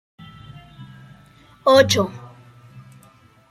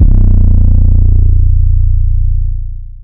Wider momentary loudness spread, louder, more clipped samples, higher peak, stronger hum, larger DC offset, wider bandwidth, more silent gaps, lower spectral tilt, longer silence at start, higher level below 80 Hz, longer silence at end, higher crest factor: first, 28 LU vs 9 LU; second, -17 LUFS vs -12 LUFS; second, under 0.1% vs 5%; about the same, -2 dBFS vs 0 dBFS; second, none vs 60 Hz at -30 dBFS; neither; first, 16 kHz vs 1 kHz; neither; second, -4 dB/octave vs -14.5 dB/octave; first, 0.8 s vs 0 s; second, -58 dBFS vs -8 dBFS; first, 0.7 s vs 0 s; first, 20 dB vs 6 dB